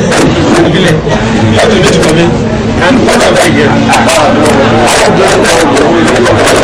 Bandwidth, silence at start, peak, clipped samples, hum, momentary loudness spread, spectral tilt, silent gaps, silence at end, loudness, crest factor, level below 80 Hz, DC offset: 11 kHz; 0 s; 0 dBFS; 3%; none; 3 LU; -4.5 dB/octave; none; 0 s; -6 LUFS; 6 dB; -24 dBFS; 0.5%